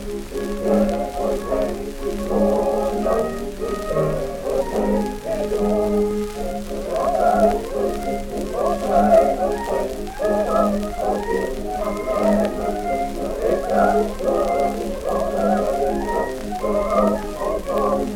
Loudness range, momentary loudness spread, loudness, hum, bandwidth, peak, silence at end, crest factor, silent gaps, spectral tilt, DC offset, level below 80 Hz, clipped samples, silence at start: 3 LU; 8 LU; -21 LUFS; none; 18 kHz; -4 dBFS; 0 s; 18 dB; none; -6 dB/octave; under 0.1%; -34 dBFS; under 0.1%; 0 s